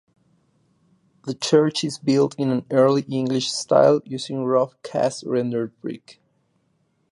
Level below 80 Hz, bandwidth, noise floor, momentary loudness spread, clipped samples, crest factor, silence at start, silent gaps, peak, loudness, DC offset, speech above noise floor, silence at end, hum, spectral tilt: -70 dBFS; 11.5 kHz; -67 dBFS; 13 LU; under 0.1%; 20 dB; 1.25 s; none; -4 dBFS; -21 LUFS; under 0.1%; 47 dB; 1 s; none; -5.5 dB/octave